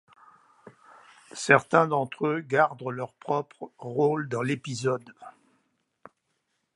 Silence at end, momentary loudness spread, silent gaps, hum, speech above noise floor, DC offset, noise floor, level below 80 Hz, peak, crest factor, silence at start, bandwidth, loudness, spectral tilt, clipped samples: 1.45 s; 13 LU; none; none; 50 dB; under 0.1%; -77 dBFS; -76 dBFS; -4 dBFS; 26 dB; 1.35 s; 11.5 kHz; -26 LUFS; -5.5 dB/octave; under 0.1%